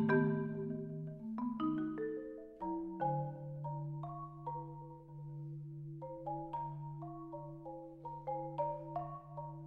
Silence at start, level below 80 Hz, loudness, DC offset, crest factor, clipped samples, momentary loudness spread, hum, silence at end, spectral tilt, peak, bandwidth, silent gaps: 0 s; -68 dBFS; -42 LUFS; under 0.1%; 22 dB; under 0.1%; 11 LU; none; 0 s; -10.5 dB/octave; -20 dBFS; 4.2 kHz; none